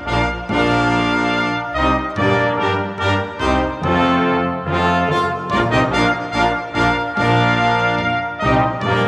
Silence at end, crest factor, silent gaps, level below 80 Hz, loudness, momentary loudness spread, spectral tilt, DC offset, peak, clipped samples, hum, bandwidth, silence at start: 0 s; 16 dB; none; -34 dBFS; -17 LUFS; 4 LU; -6 dB/octave; under 0.1%; -2 dBFS; under 0.1%; none; 11 kHz; 0 s